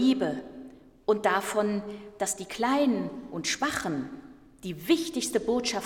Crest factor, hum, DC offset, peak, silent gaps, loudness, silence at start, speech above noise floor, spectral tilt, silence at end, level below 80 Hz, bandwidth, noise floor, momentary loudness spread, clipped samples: 18 dB; none; under 0.1%; -12 dBFS; none; -28 LUFS; 0 s; 20 dB; -3.5 dB/octave; 0 s; -60 dBFS; 17.5 kHz; -48 dBFS; 16 LU; under 0.1%